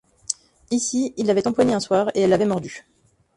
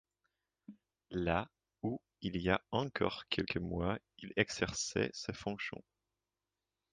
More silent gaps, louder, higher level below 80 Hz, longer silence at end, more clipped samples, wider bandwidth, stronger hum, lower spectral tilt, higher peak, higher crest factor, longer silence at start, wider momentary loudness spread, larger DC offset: neither; first, -21 LUFS vs -38 LUFS; about the same, -56 dBFS vs -58 dBFS; second, 0.55 s vs 1.15 s; neither; first, 11.5 kHz vs 9.4 kHz; neither; about the same, -4.5 dB/octave vs -4.5 dB/octave; first, -4 dBFS vs -14 dBFS; second, 18 dB vs 26 dB; second, 0.3 s vs 0.7 s; about the same, 11 LU vs 9 LU; neither